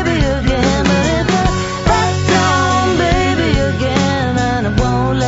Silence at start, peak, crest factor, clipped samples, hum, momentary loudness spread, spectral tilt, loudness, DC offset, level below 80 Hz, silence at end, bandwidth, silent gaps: 0 s; 0 dBFS; 14 dB; under 0.1%; none; 3 LU; -5.5 dB/octave; -14 LUFS; under 0.1%; -24 dBFS; 0 s; 8 kHz; none